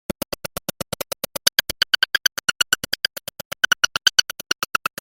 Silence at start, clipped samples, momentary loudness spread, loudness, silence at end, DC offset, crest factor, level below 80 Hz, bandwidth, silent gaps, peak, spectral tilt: 1.45 s; under 0.1%; 13 LU; -21 LUFS; 0.35 s; under 0.1%; 24 dB; -52 dBFS; 17 kHz; 3.45-3.51 s; 0 dBFS; 0 dB/octave